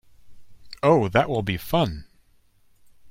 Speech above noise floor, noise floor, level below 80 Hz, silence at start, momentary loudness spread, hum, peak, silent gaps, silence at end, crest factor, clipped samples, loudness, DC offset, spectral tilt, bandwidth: 37 dB; -58 dBFS; -48 dBFS; 0.25 s; 8 LU; none; -4 dBFS; none; 0 s; 22 dB; under 0.1%; -22 LUFS; under 0.1%; -6.5 dB/octave; 16.5 kHz